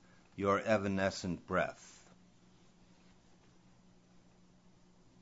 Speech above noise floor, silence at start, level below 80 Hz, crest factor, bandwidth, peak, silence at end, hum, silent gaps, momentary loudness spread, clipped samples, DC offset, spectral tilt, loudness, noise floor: 30 dB; 0.4 s; -68 dBFS; 24 dB; 7.6 kHz; -16 dBFS; 3.3 s; none; none; 23 LU; under 0.1%; under 0.1%; -4.5 dB/octave; -35 LUFS; -65 dBFS